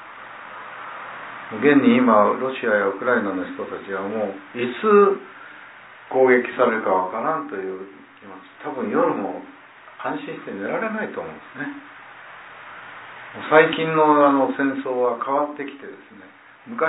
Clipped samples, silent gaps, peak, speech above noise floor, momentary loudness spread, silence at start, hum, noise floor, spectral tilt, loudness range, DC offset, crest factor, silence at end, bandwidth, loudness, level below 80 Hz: under 0.1%; none; -2 dBFS; 23 dB; 24 LU; 0 s; none; -44 dBFS; -9.5 dB/octave; 10 LU; under 0.1%; 20 dB; 0 s; 4 kHz; -20 LUFS; -70 dBFS